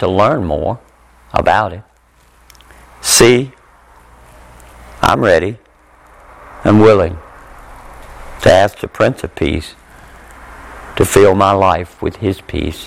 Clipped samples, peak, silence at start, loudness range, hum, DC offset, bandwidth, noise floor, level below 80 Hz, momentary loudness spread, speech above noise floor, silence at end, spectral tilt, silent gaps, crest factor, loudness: under 0.1%; 0 dBFS; 0 s; 3 LU; none; under 0.1%; 17.5 kHz; -49 dBFS; -36 dBFS; 23 LU; 38 dB; 0 s; -4.5 dB/octave; none; 14 dB; -13 LUFS